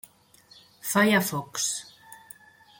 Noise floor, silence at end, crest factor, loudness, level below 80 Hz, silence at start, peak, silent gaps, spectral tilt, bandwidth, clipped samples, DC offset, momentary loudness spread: -57 dBFS; 0.65 s; 20 dB; -25 LUFS; -70 dBFS; 0.85 s; -10 dBFS; none; -3.5 dB/octave; 17 kHz; under 0.1%; under 0.1%; 25 LU